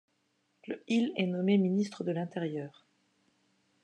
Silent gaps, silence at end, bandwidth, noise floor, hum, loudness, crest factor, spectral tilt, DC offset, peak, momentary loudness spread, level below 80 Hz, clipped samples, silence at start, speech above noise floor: none; 1.15 s; 9.2 kHz; -76 dBFS; none; -31 LUFS; 16 dB; -7 dB/octave; under 0.1%; -16 dBFS; 15 LU; -88 dBFS; under 0.1%; 0.65 s; 45 dB